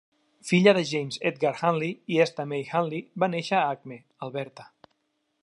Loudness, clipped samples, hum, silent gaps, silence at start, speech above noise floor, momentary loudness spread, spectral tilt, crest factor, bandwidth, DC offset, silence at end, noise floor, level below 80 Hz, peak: -26 LUFS; under 0.1%; none; none; 0.45 s; 50 dB; 16 LU; -5.5 dB/octave; 22 dB; 11.5 kHz; under 0.1%; 0.8 s; -76 dBFS; -76 dBFS; -4 dBFS